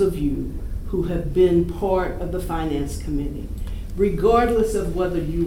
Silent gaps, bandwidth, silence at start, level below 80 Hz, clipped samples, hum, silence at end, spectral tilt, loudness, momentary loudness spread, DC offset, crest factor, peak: none; 16.5 kHz; 0 s; -30 dBFS; under 0.1%; none; 0 s; -7.5 dB/octave; -23 LUFS; 13 LU; under 0.1%; 16 dB; -4 dBFS